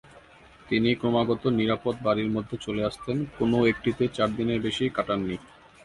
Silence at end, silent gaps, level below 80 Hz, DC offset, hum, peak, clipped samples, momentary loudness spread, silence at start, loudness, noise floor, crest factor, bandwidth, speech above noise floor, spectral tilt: 0.4 s; none; -52 dBFS; under 0.1%; none; -8 dBFS; under 0.1%; 7 LU; 0.15 s; -26 LUFS; -52 dBFS; 18 dB; 11.5 kHz; 27 dB; -6.5 dB/octave